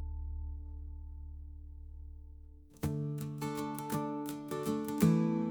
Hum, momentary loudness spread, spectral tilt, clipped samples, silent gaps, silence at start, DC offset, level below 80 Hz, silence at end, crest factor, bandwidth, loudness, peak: none; 21 LU; -7 dB/octave; under 0.1%; none; 0 s; under 0.1%; -48 dBFS; 0 s; 22 dB; 19.5 kHz; -36 LUFS; -14 dBFS